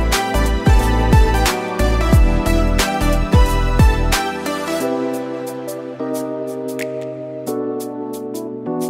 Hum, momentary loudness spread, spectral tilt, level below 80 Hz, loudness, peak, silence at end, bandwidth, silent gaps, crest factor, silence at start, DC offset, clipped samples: none; 12 LU; -5.5 dB/octave; -20 dBFS; -18 LUFS; -2 dBFS; 0 s; 16 kHz; none; 14 dB; 0 s; under 0.1%; under 0.1%